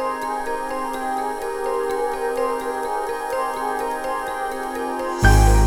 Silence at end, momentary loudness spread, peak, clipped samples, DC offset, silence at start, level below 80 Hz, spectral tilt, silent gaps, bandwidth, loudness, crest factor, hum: 0 s; 8 LU; -2 dBFS; under 0.1%; under 0.1%; 0 s; -26 dBFS; -5.5 dB/octave; none; 17 kHz; -23 LUFS; 18 dB; none